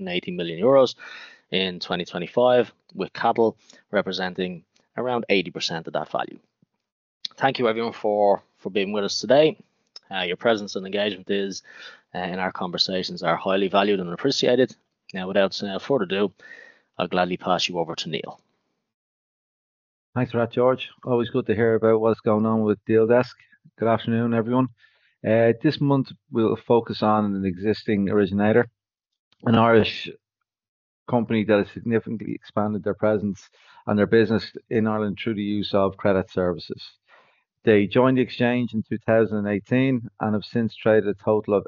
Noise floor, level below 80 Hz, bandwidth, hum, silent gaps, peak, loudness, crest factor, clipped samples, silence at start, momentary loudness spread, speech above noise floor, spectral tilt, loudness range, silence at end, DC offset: -73 dBFS; -64 dBFS; 7.4 kHz; none; 6.92-7.21 s, 18.94-20.13 s, 29.19-29.31 s, 30.69-31.06 s; -4 dBFS; -23 LUFS; 20 dB; under 0.1%; 0 s; 12 LU; 51 dB; -4.5 dB/octave; 5 LU; 0.05 s; under 0.1%